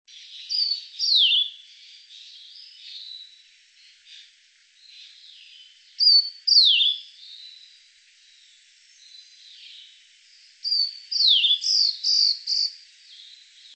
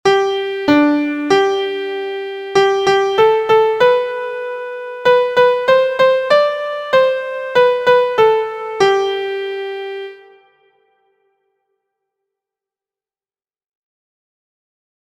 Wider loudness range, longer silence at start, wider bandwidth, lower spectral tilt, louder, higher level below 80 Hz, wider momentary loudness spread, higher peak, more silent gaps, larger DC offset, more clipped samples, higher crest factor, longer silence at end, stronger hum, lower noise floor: first, 18 LU vs 8 LU; first, 0.3 s vs 0.05 s; about the same, 8.8 kHz vs 9.4 kHz; second, 11.5 dB/octave vs -4 dB/octave; second, -18 LUFS vs -15 LUFS; second, under -90 dBFS vs -58 dBFS; first, 26 LU vs 12 LU; second, -6 dBFS vs 0 dBFS; neither; neither; neither; about the same, 20 dB vs 16 dB; second, 1 s vs 4.9 s; neither; second, -58 dBFS vs under -90 dBFS